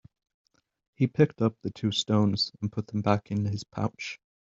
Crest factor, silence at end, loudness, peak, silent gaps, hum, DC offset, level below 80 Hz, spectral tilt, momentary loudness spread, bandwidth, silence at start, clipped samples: 22 dB; 0.3 s; -28 LUFS; -6 dBFS; none; none; under 0.1%; -64 dBFS; -6 dB/octave; 9 LU; 7.8 kHz; 1 s; under 0.1%